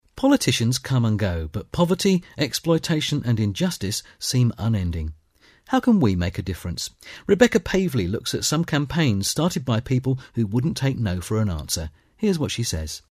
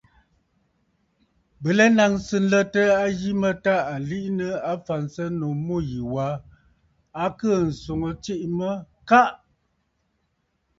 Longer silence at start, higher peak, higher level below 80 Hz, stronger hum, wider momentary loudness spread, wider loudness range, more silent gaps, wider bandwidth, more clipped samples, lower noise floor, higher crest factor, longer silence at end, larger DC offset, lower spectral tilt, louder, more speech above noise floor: second, 0.15 s vs 1.6 s; about the same, -2 dBFS vs -2 dBFS; first, -42 dBFS vs -52 dBFS; neither; about the same, 10 LU vs 11 LU; second, 2 LU vs 7 LU; neither; first, 15.5 kHz vs 7.8 kHz; neither; second, -56 dBFS vs -72 dBFS; about the same, 20 dB vs 22 dB; second, 0.15 s vs 1.45 s; neither; about the same, -5 dB/octave vs -6 dB/octave; about the same, -23 LUFS vs -23 LUFS; second, 34 dB vs 50 dB